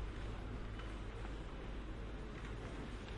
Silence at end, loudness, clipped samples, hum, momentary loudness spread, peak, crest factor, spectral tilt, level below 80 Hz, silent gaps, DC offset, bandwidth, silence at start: 0 s; -49 LUFS; under 0.1%; none; 2 LU; -34 dBFS; 12 dB; -6.5 dB/octave; -48 dBFS; none; under 0.1%; 10.5 kHz; 0 s